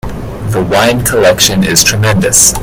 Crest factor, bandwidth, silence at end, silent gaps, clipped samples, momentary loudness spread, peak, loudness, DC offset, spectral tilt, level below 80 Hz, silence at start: 10 dB; over 20 kHz; 0 s; none; 1%; 10 LU; 0 dBFS; -8 LUFS; under 0.1%; -3 dB/octave; -28 dBFS; 0.05 s